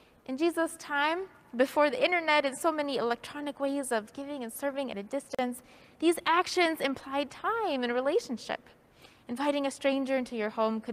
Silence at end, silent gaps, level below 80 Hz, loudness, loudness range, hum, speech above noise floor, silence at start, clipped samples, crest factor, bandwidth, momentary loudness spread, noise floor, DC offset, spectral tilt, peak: 0 s; none; -72 dBFS; -30 LUFS; 4 LU; none; 28 dB; 0.3 s; under 0.1%; 18 dB; 15.5 kHz; 11 LU; -58 dBFS; under 0.1%; -3 dB/octave; -12 dBFS